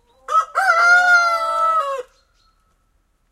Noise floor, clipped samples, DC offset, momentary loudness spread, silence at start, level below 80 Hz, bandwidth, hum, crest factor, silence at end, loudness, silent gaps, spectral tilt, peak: -63 dBFS; under 0.1%; under 0.1%; 9 LU; 0.3 s; -62 dBFS; 13.5 kHz; none; 14 dB; 1.3 s; -15 LUFS; none; 1 dB/octave; -4 dBFS